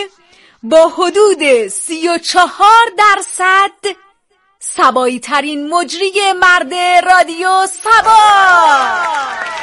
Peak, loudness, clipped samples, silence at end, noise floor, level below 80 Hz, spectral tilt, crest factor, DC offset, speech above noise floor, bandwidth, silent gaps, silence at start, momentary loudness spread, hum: 0 dBFS; -10 LUFS; 0.2%; 0 s; -57 dBFS; -52 dBFS; -1 dB/octave; 10 dB; under 0.1%; 46 dB; 12 kHz; none; 0 s; 10 LU; none